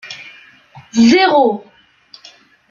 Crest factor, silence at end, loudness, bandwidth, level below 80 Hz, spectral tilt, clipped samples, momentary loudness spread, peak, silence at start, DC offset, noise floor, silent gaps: 16 dB; 1.1 s; -12 LUFS; 7.2 kHz; -56 dBFS; -4.5 dB/octave; under 0.1%; 21 LU; -2 dBFS; 0.05 s; under 0.1%; -45 dBFS; none